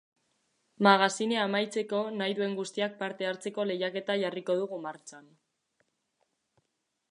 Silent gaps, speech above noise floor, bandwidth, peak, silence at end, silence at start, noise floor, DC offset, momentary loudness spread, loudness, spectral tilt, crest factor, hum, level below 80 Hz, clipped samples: none; 51 dB; 11 kHz; -6 dBFS; 1.9 s; 0.8 s; -81 dBFS; under 0.1%; 12 LU; -30 LUFS; -4 dB/octave; 26 dB; none; -84 dBFS; under 0.1%